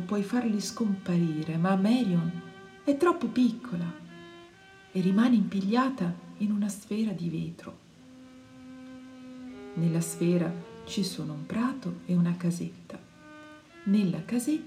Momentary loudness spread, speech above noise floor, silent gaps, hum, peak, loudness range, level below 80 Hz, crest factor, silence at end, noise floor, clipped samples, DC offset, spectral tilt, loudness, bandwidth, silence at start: 21 LU; 25 dB; none; none; -12 dBFS; 7 LU; -68 dBFS; 16 dB; 0 s; -53 dBFS; under 0.1%; under 0.1%; -6.5 dB/octave; -29 LUFS; 14.5 kHz; 0 s